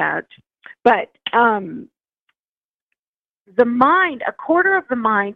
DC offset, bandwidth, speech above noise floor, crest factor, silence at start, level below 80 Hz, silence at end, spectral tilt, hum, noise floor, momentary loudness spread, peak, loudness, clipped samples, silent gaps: under 0.1%; 5.8 kHz; over 72 dB; 18 dB; 0 s; -64 dBFS; 0 s; -7 dB/octave; none; under -90 dBFS; 12 LU; -2 dBFS; -17 LUFS; under 0.1%; 2.21-2.26 s, 2.39-2.88 s, 2.99-3.45 s